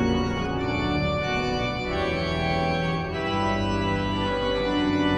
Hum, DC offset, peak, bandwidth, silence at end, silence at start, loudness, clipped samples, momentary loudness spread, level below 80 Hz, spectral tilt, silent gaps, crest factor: none; under 0.1%; -10 dBFS; 9.4 kHz; 0 s; 0 s; -25 LUFS; under 0.1%; 3 LU; -38 dBFS; -6 dB/octave; none; 14 dB